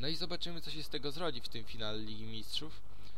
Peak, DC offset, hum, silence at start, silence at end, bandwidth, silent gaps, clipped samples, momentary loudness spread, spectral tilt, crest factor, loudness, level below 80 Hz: -20 dBFS; 2%; none; 0 s; 0 s; 16.5 kHz; none; under 0.1%; 7 LU; -4.5 dB/octave; 18 dB; -41 LUFS; -56 dBFS